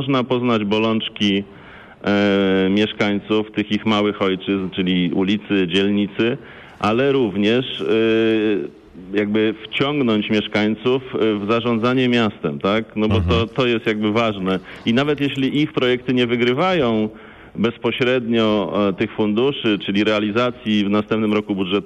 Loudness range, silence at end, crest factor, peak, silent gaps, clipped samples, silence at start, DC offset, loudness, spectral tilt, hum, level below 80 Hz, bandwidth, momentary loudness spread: 1 LU; 0 s; 12 dB; -8 dBFS; none; under 0.1%; 0 s; under 0.1%; -19 LUFS; -7 dB/octave; none; -48 dBFS; 8.6 kHz; 5 LU